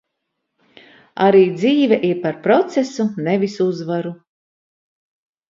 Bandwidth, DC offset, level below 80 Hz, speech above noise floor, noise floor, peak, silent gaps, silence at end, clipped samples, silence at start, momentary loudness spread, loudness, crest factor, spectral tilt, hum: 7.6 kHz; under 0.1%; -66 dBFS; 59 dB; -76 dBFS; -2 dBFS; none; 1.35 s; under 0.1%; 1.15 s; 11 LU; -17 LUFS; 18 dB; -6.5 dB/octave; none